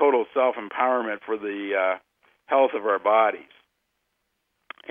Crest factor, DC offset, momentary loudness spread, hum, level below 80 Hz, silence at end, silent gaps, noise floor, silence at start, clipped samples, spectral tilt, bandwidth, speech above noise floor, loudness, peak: 20 dB; under 0.1%; 9 LU; none; -80 dBFS; 1.5 s; none; -76 dBFS; 0 s; under 0.1%; -6.5 dB/octave; 3.7 kHz; 53 dB; -24 LUFS; -6 dBFS